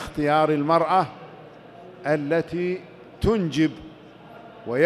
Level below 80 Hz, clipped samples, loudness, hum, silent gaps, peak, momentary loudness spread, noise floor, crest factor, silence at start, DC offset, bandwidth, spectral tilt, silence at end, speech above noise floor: -46 dBFS; under 0.1%; -23 LUFS; none; none; -6 dBFS; 24 LU; -45 dBFS; 20 dB; 0 s; under 0.1%; 13 kHz; -7 dB/octave; 0 s; 23 dB